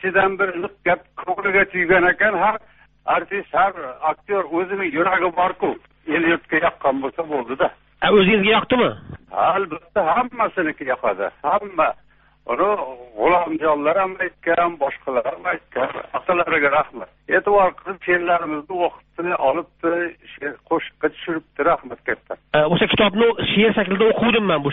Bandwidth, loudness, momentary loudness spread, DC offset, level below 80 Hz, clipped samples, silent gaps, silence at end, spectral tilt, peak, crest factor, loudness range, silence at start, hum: 4 kHz; -20 LUFS; 10 LU; under 0.1%; -50 dBFS; under 0.1%; none; 0 s; -2.5 dB/octave; -2 dBFS; 18 dB; 4 LU; 0 s; none